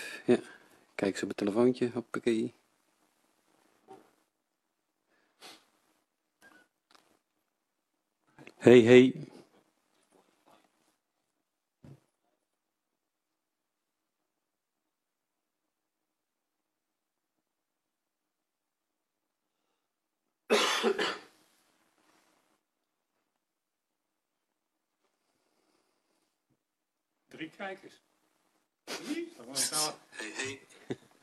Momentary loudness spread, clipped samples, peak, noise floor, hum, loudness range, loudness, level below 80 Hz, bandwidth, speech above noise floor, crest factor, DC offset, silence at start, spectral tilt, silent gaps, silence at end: 23 LU; under 0.1%; -6 dBFS; -87 dBFS; none; 23 LU; -27 LUFS; -76 dBFS; 13 kHz; 60 dB; 30 dB; under 0.1%; 0 s; -4.5 dB/octave; none; 0.3 s